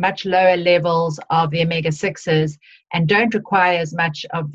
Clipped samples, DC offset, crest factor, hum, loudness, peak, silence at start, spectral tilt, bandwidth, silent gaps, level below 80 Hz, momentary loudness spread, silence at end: under 0.1%; under 0.1%; 16 dB; none; -18 LUFS; -2 dBFS; 0 s; -6 dB/octave; 8 kHz; none; -56 dBFS; 7 LU; 0 s